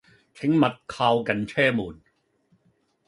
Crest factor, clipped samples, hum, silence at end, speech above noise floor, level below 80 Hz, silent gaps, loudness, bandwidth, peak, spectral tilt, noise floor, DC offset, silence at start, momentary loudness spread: 20 dB; under 0.1%; none; 1.15 s; 44 dB; -60 dBFS; none; -24 LUFS; 11.5 kHz; -6 dBFS; -6.5 dB/octave; -67 dBFS; under 0.1%; 0.4 s; 8 LU